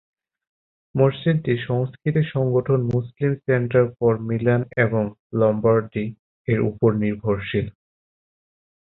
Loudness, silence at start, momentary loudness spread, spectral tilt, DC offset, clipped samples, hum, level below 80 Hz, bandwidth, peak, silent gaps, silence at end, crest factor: -22 LUFS; 0.95 s; 7 LU; -11 dB/octave; under 0.1%; under 0.1%; none; -52 dBFS; 4.1 kHz; -4 dBFS; 5.19-5.30 s, 6.19-6.45 s; 1.15 s; 18 dB